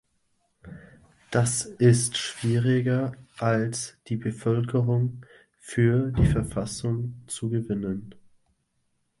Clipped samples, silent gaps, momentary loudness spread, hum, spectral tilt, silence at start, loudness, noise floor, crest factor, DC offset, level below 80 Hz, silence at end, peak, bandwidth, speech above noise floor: under 0.1%; none; 11 LU; none; -5.5 dB/octave; 0.65 s; -26 LUFS; -73 dBFS; 20 dB; under 0.1%; -44 dBFS; 1.05 s; -6 dBFS; 11.5 kHz; 48 dB